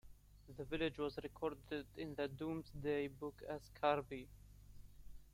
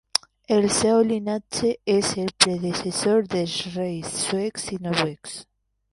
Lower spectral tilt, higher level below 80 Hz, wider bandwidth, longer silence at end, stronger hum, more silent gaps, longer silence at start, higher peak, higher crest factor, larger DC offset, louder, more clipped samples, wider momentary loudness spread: first, -6.5 dB/octave vs -3.5 dB/octave; second, -62 dBFS vs -56 dBFS; first, 16.5 kHz vs 13 kHz; second, 0.05 s vs 0.5 s; first, 50 Hz at -60 dBFS vs none; neither; about the same, 0.05 s vs 0.15 s; second, -22 dBFS vs 0 dBFS; about the same, 22 dB vs 24 dB; neither; second, -44 LUFS vs -23 LUFS; neither; first, 24 LU vs 9 LU